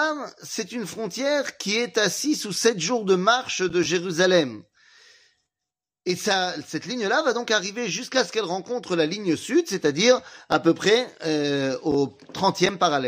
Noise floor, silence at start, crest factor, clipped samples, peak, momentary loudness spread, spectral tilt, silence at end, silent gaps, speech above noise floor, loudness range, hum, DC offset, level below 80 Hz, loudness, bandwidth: -88 dBFS; 0 s; 18 dB; under 0.1%; -6 dBFS; 10 LU; -3.5 dB/octave; 0 s; none; 65 dB; 4 LU; none; under 0.1%; -66 dBFS; -23 LUFS; 15.5 kHz